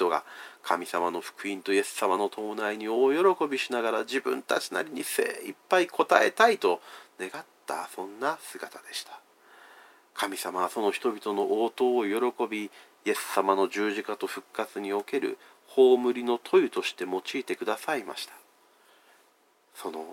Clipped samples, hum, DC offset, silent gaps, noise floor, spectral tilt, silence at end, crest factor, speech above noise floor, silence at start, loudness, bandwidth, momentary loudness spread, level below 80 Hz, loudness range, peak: under 0.1%; none; under 0.1%; none; -65 dBFS; -3 dB/octave; 0 s; 26 dB; 37 dB; 0 s; -28 LUFS; 17 kHz; 16 LU; under -90 dBFS; 8 LU; -4 dBFS